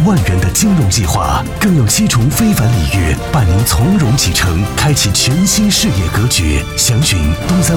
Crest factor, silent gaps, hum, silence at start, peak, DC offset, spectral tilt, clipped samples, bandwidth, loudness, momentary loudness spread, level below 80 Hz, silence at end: 8 dB; none; none; 0 s; -2 dBFS; 0.3%; -4.5 dB/octave; under 0.1%; 19 kHz; -12 LUFS; 4 LU; -22 dBFS; 0 s